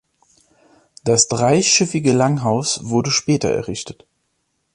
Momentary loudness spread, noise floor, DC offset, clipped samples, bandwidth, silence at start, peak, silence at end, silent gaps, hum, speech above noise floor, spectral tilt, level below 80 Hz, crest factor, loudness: 12 LU; -70 dBFS; under 0.1%; under 0.1%; 11.5 kHz; 1.05 s; 0 dBFS; 0.8 s; none; none; 52 dB; -4 dB/octave; -52 dBFS; 18 dB; -17 LUFS